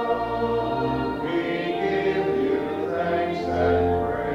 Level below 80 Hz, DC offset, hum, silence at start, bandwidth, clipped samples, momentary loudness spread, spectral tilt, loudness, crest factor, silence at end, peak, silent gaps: -44 dBFS; under 0.1%; none; 0 s; 10 kHz; under 0.1%; 4 LU; -7.5 dB/octave; -24 LUFS; 14 dB; 0 s; -10 dBFS; none